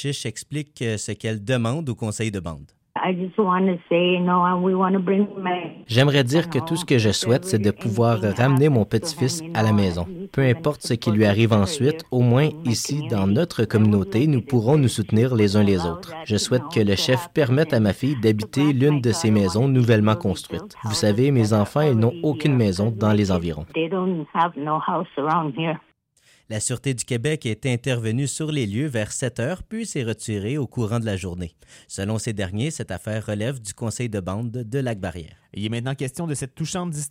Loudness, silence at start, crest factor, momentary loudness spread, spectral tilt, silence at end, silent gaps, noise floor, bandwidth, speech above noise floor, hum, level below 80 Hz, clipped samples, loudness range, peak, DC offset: -22 LUFS; 0 s; 14 dB; 10 LU; -6 dB/octave; 0 s; none; -59 dBFS; 16 kHz; 38 dB; none; -52 dBFS; under 0.1%; 7 LU; -8 dBFS; under 0.1%